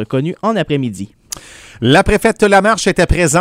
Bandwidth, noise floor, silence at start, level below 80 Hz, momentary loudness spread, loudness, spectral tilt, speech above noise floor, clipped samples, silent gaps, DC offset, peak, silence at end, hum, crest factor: 16.5 kHz; -32 dBFS; 0 s; -26 dBFS; 18 LU; -13 LUFS; -4.5 dB/octave; 20 dB; 0.1%; none; under 0.1%; 0 dBFS; 0 s; none; 14 dB